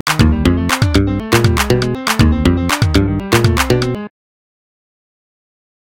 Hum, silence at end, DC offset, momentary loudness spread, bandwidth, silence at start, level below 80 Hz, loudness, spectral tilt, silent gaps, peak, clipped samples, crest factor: none; 1.9 s; 0.7%; 4 LU; 17.5 kHz; 0.05 s; -24 dBFS; -14 LUFS; -5.5 dB/octave; none; 0 dBFS; under 0.1%; 14 dB